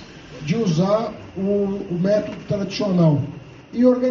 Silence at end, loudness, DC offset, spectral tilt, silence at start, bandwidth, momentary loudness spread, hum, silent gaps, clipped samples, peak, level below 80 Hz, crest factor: 0 s; -21 LUFS; under 0.1%; -7.5 dB/octave; 0 s; 7 kHz; 14 LU; none; none; under 0.1%; -4 dBFS; -52 dBFS; 16 dB